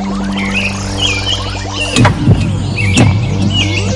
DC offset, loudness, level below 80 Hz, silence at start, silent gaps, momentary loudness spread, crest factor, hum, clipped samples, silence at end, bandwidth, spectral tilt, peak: under 0.1%; -12 LUFS; -26 dBFS; 0 s; none; 6 LU; 12 dB; none; under 0.1%; 0 s; 11.5 kHz; -5 dB/octave; 0 dBFS